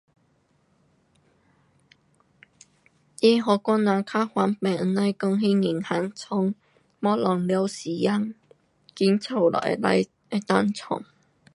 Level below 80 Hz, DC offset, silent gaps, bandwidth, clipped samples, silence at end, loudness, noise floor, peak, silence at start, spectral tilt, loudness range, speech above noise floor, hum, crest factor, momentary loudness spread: -70 dBFS; under 0.1%; none; 11.5 kHz; under 0.1%; 0.5 s; -24 LUFS; -66 dBFS; -4 dBFS; 3.2 s; -6.5 dB/octave; 4 LU; 43 dB; none; 20 dB; 7 LU